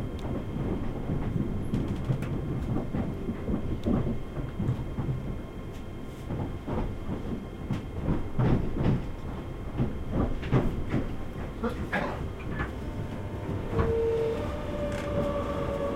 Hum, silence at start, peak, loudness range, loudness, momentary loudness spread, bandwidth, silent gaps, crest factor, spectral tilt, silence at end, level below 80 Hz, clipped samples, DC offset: none; 0 s; -12 dBFS; 4 LU; -32 LUFS; 9 LU; 15 kHz; none; 18 dB; -8.5 dB/octave; 0 s; -36 dBFS; under 0.1%; under 0.1%